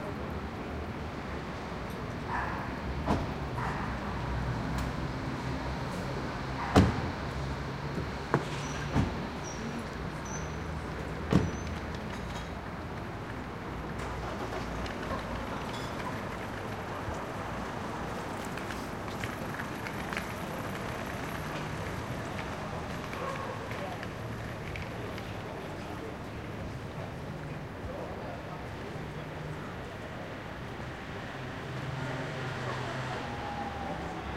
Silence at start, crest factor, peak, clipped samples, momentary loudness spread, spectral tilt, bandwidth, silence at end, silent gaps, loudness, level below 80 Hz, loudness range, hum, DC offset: 0 s; 28 dB; -8 dBFS; under 0.1%; 8 LU; -6 dB/octave; 16 kHz; 0 s; none; -36 LUFS; -46 dBFS; 8 LU; none; under 0.1%